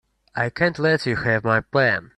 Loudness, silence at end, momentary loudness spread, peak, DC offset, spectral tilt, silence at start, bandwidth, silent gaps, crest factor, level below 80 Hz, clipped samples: -21 LUFS; 0.1 s; 7 LU; -4 dBFS; under 0.1%; -6.5 dB/octave; 0.35 s; 11.5 kHz; none; 16 dB; -52 dBFS; under 0.1%